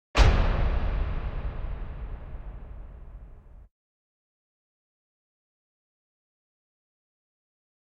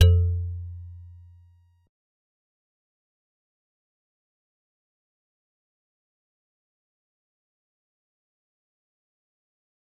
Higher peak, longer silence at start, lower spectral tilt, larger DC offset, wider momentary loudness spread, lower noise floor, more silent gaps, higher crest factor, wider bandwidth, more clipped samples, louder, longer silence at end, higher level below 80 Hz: second, -8 dBFS vs -4 dBFS; first, 0.15 s vs 0 s; about the same, -6 dB/octave vs -6 dB/octave; neither; about the same, 24 LU vs 25 LU; second, -47 dBFS vs -58 dBFS; neither; about the same, 24 dB vs 28 dB; first, 8.6 kHz vs 6.2 kHz; neither; second, -29 LUFS vs -25 LUFS; second, 4.35 s vs 8.95 s; first, -32 dBFS vs -48 dBFS